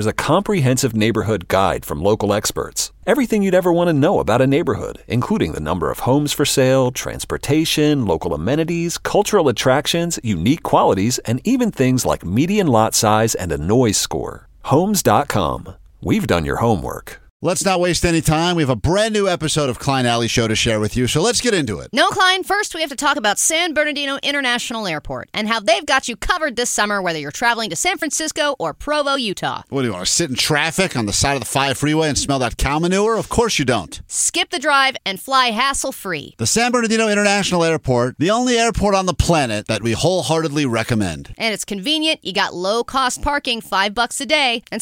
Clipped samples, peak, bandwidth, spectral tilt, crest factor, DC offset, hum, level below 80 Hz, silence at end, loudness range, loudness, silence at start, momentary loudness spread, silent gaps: under 0.1%; -2 dBFS; 17 kHz; -4 dB/octave; 16 dB; under 0.1%; none; -38 dBFS; 0 s; 2 LU; -17 LUFS; 0 s; 7 LU; 17.30-17.40 s